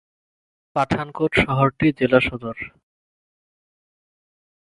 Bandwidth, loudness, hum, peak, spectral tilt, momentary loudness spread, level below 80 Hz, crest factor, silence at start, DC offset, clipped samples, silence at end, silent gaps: 11.5 kHz; -20 LUFS; none; 0 dBFS; -7 dB/octave; 14 LU; -46 dBFS; 24 dB; 0.75 s; under 0.1%; under 0.1%; 2.05 s; none